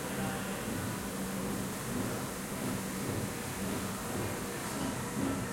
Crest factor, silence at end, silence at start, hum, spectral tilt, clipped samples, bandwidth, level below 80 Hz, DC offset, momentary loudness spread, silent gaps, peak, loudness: 16 dB; 0 s; 0 s; none; -4.5 dB/octave; under 0.1%; 16.5 kHz; -54 dBFS; under 0.1%; 2 LU; none; -20 dBFS; -36 LUFS